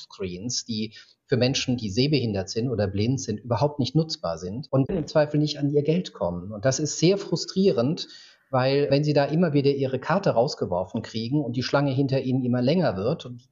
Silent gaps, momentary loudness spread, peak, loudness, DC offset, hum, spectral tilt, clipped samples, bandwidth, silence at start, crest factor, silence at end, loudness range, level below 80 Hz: none; 8 LU; -8 dBFS; -25 LUFS; under 0.1%; none; -6 dB/octave; under 0.1%; 7.8 kHz; 0 s; 16 dB; 0.1 s; 2 LU; -58 dBFS